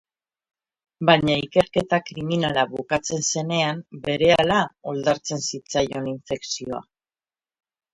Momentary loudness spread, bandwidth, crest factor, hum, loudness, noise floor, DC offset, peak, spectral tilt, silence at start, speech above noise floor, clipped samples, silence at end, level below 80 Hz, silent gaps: 11 LU; 11.5 kHz; 22 dB; none; -22 LUFS; under -90 dBFS; under 0.1%; -2 dBFS; -4 dB/octave; 1 s; over 68 dB; under 0.1%; 1.1 s; -54 dBFS; none